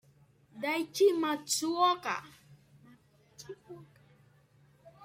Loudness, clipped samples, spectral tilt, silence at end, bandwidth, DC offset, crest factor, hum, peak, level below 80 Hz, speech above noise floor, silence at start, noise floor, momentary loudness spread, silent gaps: -30 LUFS; under 0.1%; -2.5 dB/octave; 0 s; 16 kHz; under 0.1%; 18 dB; none; -16 dBFS; -80 dBFS; 34 dB; 0.55 s; -64 dBFS; 24 LU; none